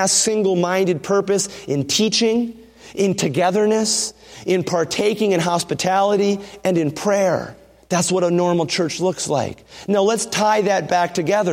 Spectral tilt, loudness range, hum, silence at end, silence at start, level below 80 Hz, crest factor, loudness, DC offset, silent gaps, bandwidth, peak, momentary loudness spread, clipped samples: -4 dB/octave; 1 LU; none; 0 s; 0 s; -58 dBFS; 16 dB; -19 LUFS; under 0.1%; none; 16.5 kHz; -2 dBFS; 6 LU; under 0.1%